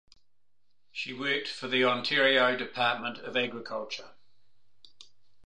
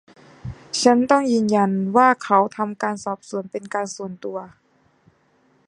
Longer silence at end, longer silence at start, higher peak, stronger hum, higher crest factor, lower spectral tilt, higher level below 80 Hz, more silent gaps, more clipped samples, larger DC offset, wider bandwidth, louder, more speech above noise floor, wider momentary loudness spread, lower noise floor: first, 1.35 s vs 1.2 s; first, 0.95 s vs 0.45 s; second, -10 dBFS vs -2 dBFS; neither; about the same, 22 dB vs 20 dB; about the same, -4 dB/octave vs -5 dB/octave; second, -78 dBFS vs -56 dBFS; neither; neither; first, 0.3% vs under 0.1%; about the same, 10 kHz vs 11 kHz; second, -28 LUFS vs -20 LUFS; first, 54 dB vs 41 dB; about the same, 14 LU vs 15 LU; first, -84 dBFS vs -61 dBFS